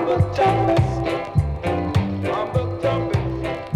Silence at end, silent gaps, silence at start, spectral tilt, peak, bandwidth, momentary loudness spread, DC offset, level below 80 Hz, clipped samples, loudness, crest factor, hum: 0 s; none; 0 s; -8 dB/octave; -6 dBFS; 11.5 kHz; 6 LU; under 0.1%; -34 dBFS; under 0.1%; -21 LUFS; 16 dB; none